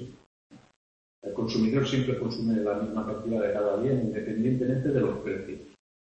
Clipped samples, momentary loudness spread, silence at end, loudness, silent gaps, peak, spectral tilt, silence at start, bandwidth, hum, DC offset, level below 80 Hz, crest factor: under 0.1%; 10 LU; 0.35 s; -28 LUFS; 0.26-0.50 s, 0.76-1.22 s; -12 dBFS; -7.5 dB/octave; 0 s; 8.4 kHz; none; under 0.1%; -56 dBFS; 16 dB